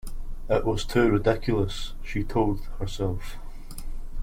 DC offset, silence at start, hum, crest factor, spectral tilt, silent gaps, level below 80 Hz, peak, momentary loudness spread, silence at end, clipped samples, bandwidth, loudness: under 0.1%; 0.05 s; none; 18 dB; -6.5 dB/octave; none; -32 dBFS; -8 dBFS; 20 LU; 0 s; under 0.1%; 16 kHz; -27 LUFS